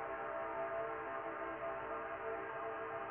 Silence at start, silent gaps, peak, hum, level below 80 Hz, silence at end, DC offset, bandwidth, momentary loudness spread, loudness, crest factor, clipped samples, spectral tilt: 0 s; none; -30 dBFS; none; -70 dBFS; 0 s; under 0.1%; 3.7 kHz; 2 LU; -43 LUFS; 12 dB; under 0.1%; -3.5 dB/octave